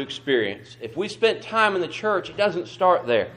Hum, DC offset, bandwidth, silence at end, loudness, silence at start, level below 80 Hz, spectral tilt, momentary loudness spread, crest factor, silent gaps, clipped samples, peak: none; under 0.1%; 10.5 kHz; 0 s; -23 LUFS; 0 s; -64 dBFS; -4.5 dB/octave; 9 LU; 18 dB; none; under 0.1%; -6 dBFS